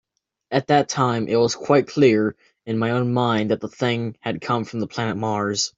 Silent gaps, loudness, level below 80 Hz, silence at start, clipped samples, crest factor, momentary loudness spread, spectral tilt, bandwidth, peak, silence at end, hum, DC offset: none; -21 LUFS; -60 dBFS; 0.5 s; under 0.1%; 18 dB; 9 LU; -5.5 dB/octave; 7.8 kHz; -2 dBFS; 0.1 s; none; under 0.1%